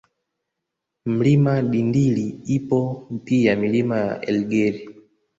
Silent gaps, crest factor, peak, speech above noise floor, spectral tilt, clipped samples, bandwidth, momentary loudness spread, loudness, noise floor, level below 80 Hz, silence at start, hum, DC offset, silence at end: none; 16 dB; -4 dBFS; 61 dB; -8 dB/octave; under 0.1%; 7.8 kHz; 8 LU; -21 LUFS; -81 dBFS; -56 dBFS; 1.05 s; none; under 0.1%; 0.45 s